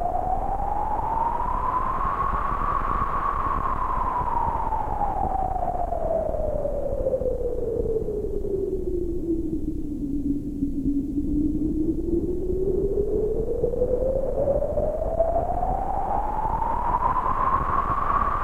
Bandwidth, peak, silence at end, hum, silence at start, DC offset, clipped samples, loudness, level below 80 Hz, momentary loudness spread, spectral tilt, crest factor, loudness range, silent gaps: 4 kHz; -8 dBFS; 0 s; none; 0 s; under 0.1%; under 0.1%; -26 LUFS; -30 dBFS; 4 LU; -9.5 dB/octave; 16 dB; 3 LU; none